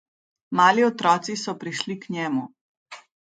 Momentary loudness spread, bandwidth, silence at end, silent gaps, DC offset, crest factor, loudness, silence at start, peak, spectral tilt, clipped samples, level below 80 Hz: 12 LU; 9.4 kHz; 0.25 s; 2.61-2.86 s; under 0.1%; 22 dB; -23 LUFS; 0.5 s; -4 dBFS; -4 dB/octave; under 0.1%; -74 dBFS